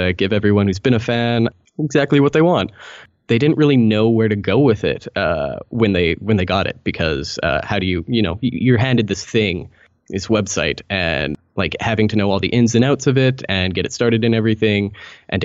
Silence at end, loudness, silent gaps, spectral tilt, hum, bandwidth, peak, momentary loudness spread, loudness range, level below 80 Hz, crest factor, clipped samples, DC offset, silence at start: 0 s; -17 LUFS; none; -5 dB/octave; none; 8 kHz; -4 dBFS; 8 LU; 3 LU; -42 dBFS; 14 dB; under 0.1%; under 0.1%; 0 s